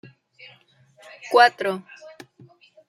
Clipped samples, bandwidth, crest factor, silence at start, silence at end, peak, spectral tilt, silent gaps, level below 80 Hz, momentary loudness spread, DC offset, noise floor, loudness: under 0.1%; 14.5 kHz; 22 dB; 1.25 s; 1.1 s; -2 dBFS; -3.5 dB/octave; none; -80 dBFS; 25 LU; under 0.1%; -56 dBFS; -19 LUFS